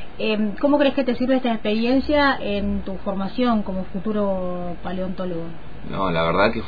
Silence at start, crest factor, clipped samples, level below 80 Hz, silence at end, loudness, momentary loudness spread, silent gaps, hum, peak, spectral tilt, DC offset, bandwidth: 0 s; 18 dB; under 0.1%; -40 dBFS; 0 s; -22 LUFS; 11 LU; none; none; -4 dBFS; -8.5 dB/octave; 4%; 5 kHz